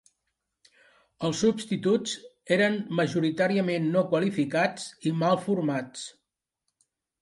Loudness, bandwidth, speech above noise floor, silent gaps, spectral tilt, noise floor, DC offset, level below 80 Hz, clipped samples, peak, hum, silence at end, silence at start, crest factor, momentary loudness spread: -27 LUFS; 11.5 kHz; 57 dB; none; -5.5 dB/octave; -83 dBFS; under 0.1%; -70 dBFS; under 0.1%; -10 dBFS; none; 1.1 s; 1.2 s; 18 dB; 8 LU